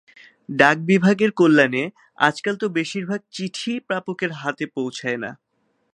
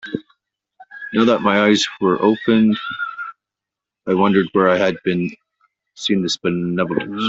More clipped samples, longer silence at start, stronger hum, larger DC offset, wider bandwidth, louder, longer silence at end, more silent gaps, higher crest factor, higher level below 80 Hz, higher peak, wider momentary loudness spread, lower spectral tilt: neither; first, 0.5 s vs 0.05 s; neither; neither; first, 11 kHz vs 8 kHz; second, -21 LUFS vs -18 LUFS; first, 0.6 s vs 0 s; neither; first, 22 dB vs 16 dB; second, -68 dBFS vs -58 dBFS; about the same, 0 dBFS vs -2 dBFS; about the same, 13 LU vs 14 LU; about the same, -5.5 dB/octave vs -5.5 dB/octave